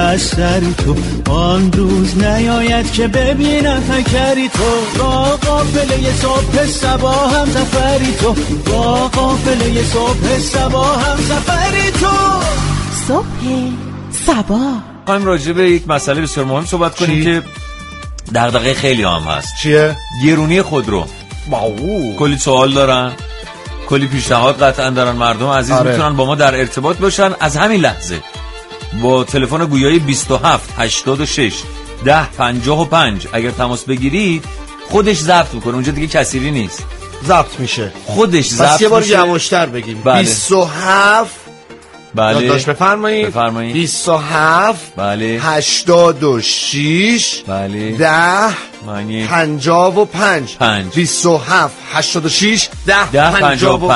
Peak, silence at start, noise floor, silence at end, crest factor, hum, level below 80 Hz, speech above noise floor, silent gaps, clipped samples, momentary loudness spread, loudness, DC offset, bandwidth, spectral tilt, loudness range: 0 dBFS; 0 s; -36 dBFS; 0 s; 12 dB; none; -26 dBFS; 24 dB; none; under 0.1%; 9 LU; -13 LUFS; under 0.1%; 11.5 kHz; -4.5 dB/octave; 3 LU